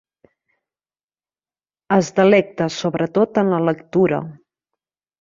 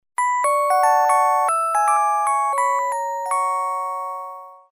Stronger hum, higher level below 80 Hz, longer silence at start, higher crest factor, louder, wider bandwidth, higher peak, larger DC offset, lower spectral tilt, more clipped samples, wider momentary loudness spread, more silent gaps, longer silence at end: neither; first, -60 dBFS vs -78 dBFS; first, 1.9 s vs 0.2 s; about the same, 18 dB vs 14 dB; about the same, -18 LUFS vs -19 LUFS; second, 7.6 kHz vs 16 kHz; first, -2 dBFS vs -6 dBFS; neither; first, -6.5 dB/octave vs 3 dB/octave; neither; second, 8 LU vs 11 LU; neither; first, 0.9 s vs 0.25 s